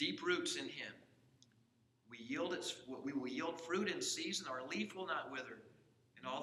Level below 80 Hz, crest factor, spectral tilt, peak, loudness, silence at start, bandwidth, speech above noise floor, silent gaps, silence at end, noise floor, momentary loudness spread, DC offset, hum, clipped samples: -88 dBFS; 20 dB; -2.5 dB/octave; -24 dBFS; -42 LUFS; 0 s; 13.5 kHz; 32 dB; none; 0 s; -75 dBFS; 13 LU; under 0.1%; none; under 0.1%